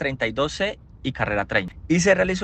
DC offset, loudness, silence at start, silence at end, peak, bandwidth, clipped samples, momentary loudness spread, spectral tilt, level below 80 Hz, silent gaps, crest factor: under 0.1%; -23 LUFS; 0 s; 0 s; -4 dBFS; 9 kHz; under 0.1%; 9 LU; -4.5 dB/octave; -44 dBFS; none; 18 dB